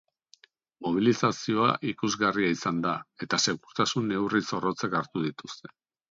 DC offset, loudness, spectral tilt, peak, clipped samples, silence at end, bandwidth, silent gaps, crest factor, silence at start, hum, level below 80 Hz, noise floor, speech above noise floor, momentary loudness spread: under 0.1%; -27 LUFS; -4.5 dB/octave; -8 dBFS; under 0.1%; 0.45 s; 7.8 kHz; none; 20 dB; 0.8 s; none; -66 dBFS; -61 dBFS; 33 dB; 9 LU